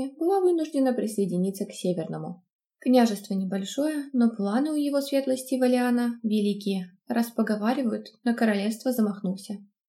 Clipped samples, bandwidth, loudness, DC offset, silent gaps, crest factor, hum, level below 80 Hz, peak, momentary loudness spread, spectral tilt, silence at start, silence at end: under 0.1%; 16 kHz; -26 LUFS; under 0.1%; 2.53-2.59 s; 18 dB; none; -84 dBFS; -8 dBFS; 8 LU; -6 dB/octave; 0 s; 0.25 s